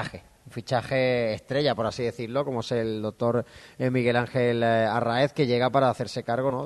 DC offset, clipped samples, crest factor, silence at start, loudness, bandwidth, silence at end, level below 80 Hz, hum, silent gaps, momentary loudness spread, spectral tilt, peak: under 0.1%; under 0.1%; 18 dB; 0 s; -26 LUFS; 12.5 kHz; 0 s; -60 dBFS; none; none; 8 LU; -6.5 dB/octave; -8 dBFS